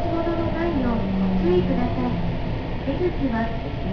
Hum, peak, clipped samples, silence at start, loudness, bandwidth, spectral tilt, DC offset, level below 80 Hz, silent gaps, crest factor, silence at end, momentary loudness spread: none; -8 dBFS; under 0.1%; 0 s; -24 LUFS; 5.4 kHz; -9 dB/octave; under 0.1%; -30 dBFS; none; 14 dB; 0 s; 7 LU